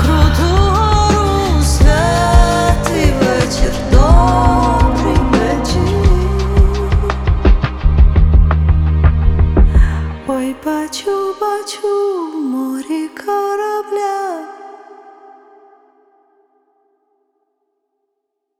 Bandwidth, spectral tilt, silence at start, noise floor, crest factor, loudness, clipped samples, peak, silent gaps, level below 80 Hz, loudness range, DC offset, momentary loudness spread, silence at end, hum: 14.5 kHz; -6 dB/octave; 0 s; -73 dBFS; 12 dB; -14 LUFS; under 0.1%; 0 dBFS; none; -16 dBFS; 9 LU; under 0.1%; 8 LU; 3.85 s; none